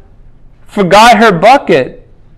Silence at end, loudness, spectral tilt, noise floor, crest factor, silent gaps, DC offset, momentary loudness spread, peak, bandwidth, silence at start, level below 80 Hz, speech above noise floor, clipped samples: 0.45 s; -6 LUFS; -4.5 dB/octave; -36 dBFS; 8 dB; none; under 0.1%; 15 LU; 0 dBFS; 16 kHz; 0.75 s; -38 dBFS; 30 dB; 5%